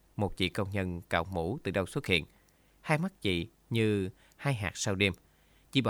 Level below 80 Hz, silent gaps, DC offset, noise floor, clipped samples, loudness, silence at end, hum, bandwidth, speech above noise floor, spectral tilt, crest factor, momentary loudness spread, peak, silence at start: -56 dBFS; none; under 0.1%; -64 dBFS; under 0.1%; -32 LUFS; 0 s; none; 18 kHz; 33 dB; -5 dB/octave; 22 dB; 7 LU; -10 dBFS; 0.15 s